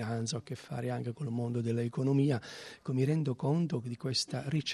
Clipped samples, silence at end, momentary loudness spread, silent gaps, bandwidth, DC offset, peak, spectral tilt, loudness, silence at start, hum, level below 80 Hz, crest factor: under 0.1%; 0 s; 8 LU; none; 12 kHz; under 0.1%; -18 dBFS; -6 dB/octave; -33 LUFS; 0 s; none; -72 dBFS; 16 dB